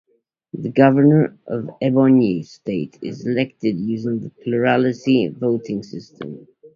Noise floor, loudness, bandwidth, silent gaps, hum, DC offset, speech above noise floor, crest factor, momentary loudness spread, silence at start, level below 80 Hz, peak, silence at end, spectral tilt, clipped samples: -38 dBFS; -19 LUFS; 7 kHz; none; none; under 0.1%; 20 dB; 18 dB; 19 LU; 0.55 s; -58 dBFS; 0 dBFS; 0.1 s; -8.5 dB/octave; under 0.1%